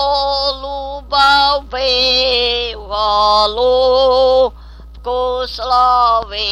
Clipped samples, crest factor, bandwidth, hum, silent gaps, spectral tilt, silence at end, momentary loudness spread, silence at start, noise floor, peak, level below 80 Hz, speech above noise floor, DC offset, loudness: under 0.1%; 12 dB; 11 kHz; none; none; -3 dB/octave; 0 s; 9 LU; 0 s; -34 dBFS; -2 dBFS; -34 dBFS; 21 dB; under 0.1%; -13 LUFS